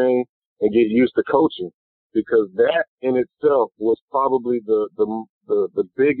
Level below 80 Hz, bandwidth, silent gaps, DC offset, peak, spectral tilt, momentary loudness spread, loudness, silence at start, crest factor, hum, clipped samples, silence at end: -62 dBFS; 4.3 kHz; 0.29-0.56 s, 1.74-2.10 s, 2.88-2.98 s, 4.02-4.08 s, 5.29-5.41 s; under 0.1%; -4 dBFS; -4.5 dB/octave; 7 LU; -20 LUFS; 0 s; 16 dB; none; under 0.1%; 0 s